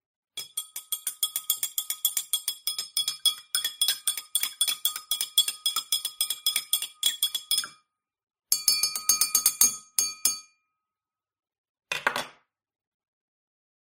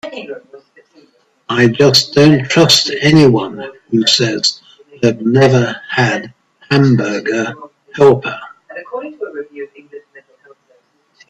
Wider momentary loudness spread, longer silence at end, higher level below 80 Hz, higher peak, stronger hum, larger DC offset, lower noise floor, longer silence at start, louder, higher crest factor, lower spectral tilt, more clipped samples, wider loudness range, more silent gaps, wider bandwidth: second, 12 LU vs 21 LU; first, 1.65 s vs 1.1 s; second, -76 dBFS vs -52 dBFS; second, -4 dBFS vs 0 dBFS; neither; neither; first, under -90 dBFS vs -55 dBFS; first, 0.35 s vs 0.05 s; second, -25 LUFS vs -12 LUFS; first, 26 dB vs 14 dB; second, 3 dB/octave vs -5 dB/octave; neither; about the same, 7 LU vs 8 LU; first, 11.58-11.75 s vs none; about the same, 16.5 kHz vs 15 kHz